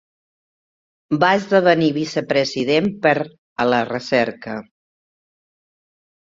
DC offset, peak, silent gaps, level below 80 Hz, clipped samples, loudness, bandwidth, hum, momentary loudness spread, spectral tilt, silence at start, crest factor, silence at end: under 0.1%; -2 dBFS; 3.38-3.56 s; -60 dBFS; under 0.1%; -18 LUFS; 7.8 kHz; none; 11 LU; -5.5 dB/octave; 1.1 s; 20 dB; 1.75 s